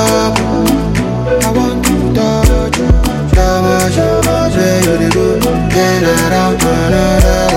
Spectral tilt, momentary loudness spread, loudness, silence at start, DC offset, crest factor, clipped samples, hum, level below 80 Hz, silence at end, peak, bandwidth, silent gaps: -5.5 dB/octave; 2 LU; -11 LUFS; 0 s; under 0.1%; 10 dB; under 0.1%; none; -18 dBFS; 0 s; 0 dBFS; 17 kHz; none